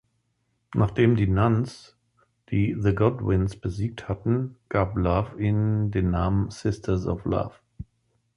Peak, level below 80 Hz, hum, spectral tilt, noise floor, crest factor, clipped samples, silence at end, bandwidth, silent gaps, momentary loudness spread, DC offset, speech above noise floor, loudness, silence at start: -6 dBFS; -40 dBFS; none; -8.5 dB/octave; -73 dBFS; 18 dB; under 0.1%; 0.55 s; 10.5 kHz; none; 10 LU; under 0.1%; 49 dB; -25 LUFS; 0.7 s